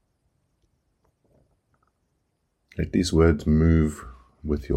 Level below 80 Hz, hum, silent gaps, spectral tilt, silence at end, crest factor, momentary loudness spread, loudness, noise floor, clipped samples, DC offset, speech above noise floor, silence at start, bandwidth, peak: -34 dBFS; none; none; -7 dB/octave; 0 s; 20 dB; 19 LU; -22 LUFS; -74 dBFS; under 0.1%; under 0.1%; 53 dB; 2.8 s; 13 kHz; -6 dBFS